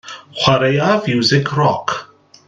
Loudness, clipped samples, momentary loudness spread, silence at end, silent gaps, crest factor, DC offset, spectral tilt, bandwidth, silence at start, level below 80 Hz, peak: -15 LUFS; under 0.1%; 10 LU; 0.45 s; none; 16 dB; under 0.1%; -5.5 dB/octave; 9 kHz; 0.05 s; -52 dBFS; 0 dBFS